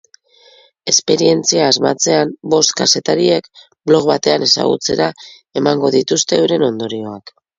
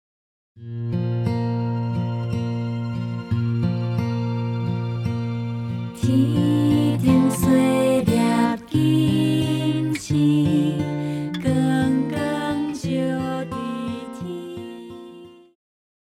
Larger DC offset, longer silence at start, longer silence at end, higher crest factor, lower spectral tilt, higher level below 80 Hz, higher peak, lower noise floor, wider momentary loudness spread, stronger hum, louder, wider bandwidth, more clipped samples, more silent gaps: neither; first, 0.85 s vs 0.55 s; second, 0.3 s vs 0.7 s; about the same, 16 dB vs 16 dB; second, -3 dB/octave vs -7 dB/octave; second, -56 dBFS vs -50 dBFS; first, 0 dBFS vs -4 dBFS; first, -48 dBFS vs -43 dBFS; about the same, 11 LU vs 13 LU; neither; first, -14 LUFS vs -22 LUFS; second, 7.8 kHz vs 15 kHz; neither; neither